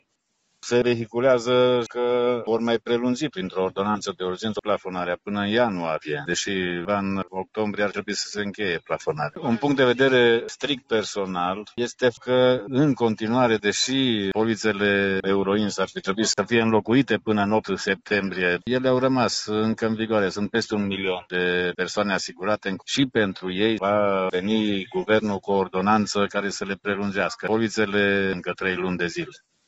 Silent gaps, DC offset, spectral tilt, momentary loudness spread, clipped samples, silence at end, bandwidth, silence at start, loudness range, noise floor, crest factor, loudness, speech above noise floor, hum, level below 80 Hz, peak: none; under 0.1%; -4.5 dB/octave; 7 LU; under 0.1%; 0.3 s; 8.2 kHz; 0.65 s; 4 LU; -73 dBFS; 18 dB; -23 LUFS; 49 dB; none; -60 dBFS; -6 dBFS